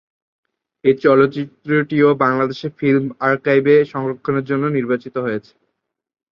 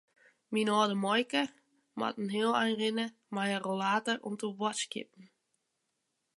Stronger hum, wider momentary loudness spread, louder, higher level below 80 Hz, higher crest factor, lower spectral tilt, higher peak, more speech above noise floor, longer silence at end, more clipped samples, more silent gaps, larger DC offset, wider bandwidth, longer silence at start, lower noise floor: neither; about the same, 10 LU vs 10 LU; first, -17 LUFS vs -32 LUFS; first, -62 dBFS vs -86 dBFS; about the same, 18 dB vs 20 dB; first, -9 dB/octave vs -4 dB/octave; first, 0 dBFS vs -14 dBFS; first, 58 dB vs 50 dB; second, 0.9 s vs 1.1 s; neither; neither; neither; second, 6 kHz vs 11.5 kHz; first, 0.85 s vs 0.5 s; second, -75 dBFS vs -82 dBFS